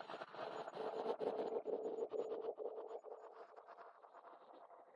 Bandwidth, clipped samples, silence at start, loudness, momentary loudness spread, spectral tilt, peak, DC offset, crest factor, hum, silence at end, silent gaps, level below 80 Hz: 10.5 kHz; under 0.1%; 0 s; -46 LUFS; 18 LU; -5.5 dB/octave; -28 dBFS; under 0.1%; 20 dB; none; 0 s; none; under -90 dBFS